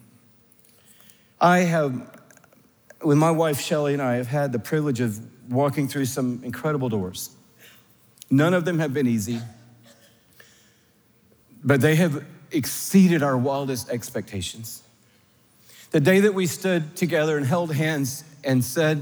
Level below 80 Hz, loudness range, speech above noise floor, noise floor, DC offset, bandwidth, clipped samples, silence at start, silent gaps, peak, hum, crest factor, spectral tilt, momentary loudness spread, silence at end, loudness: -70 dBFS; 4 LU; 38 dB; -60 dBFS; under 0.1%; over 20 kHz; under 0.1%; 1.4 s; none; -4 dBFS; none; 20 dB; -6 dB/octave; 13 LU; 0 s; -23 LUFS